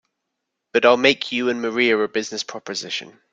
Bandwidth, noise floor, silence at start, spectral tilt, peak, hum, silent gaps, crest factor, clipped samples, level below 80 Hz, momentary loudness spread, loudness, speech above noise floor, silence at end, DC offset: 9 kHz; -79 dBFS; 0.75 s; -3 dB/octave; -2 dBFS; none; none; 20 dB; under 0.1%; -66 dBFS; 13 LU; -20 LUFS; 59 dB; 0.2 s; under 0.1%